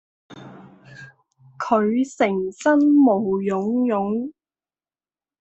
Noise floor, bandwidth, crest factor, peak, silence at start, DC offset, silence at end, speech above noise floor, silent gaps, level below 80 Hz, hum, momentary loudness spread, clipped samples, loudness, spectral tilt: under -90 dBFS; 8.2 kHz; 16 dB; -4 dBFS; 0.3 s; under 0.1%; 1.1 s; over 71 dB; none; -66 dBFS; none; 12 LU; under 0.1%; -20 LUFS; -7 dB/octave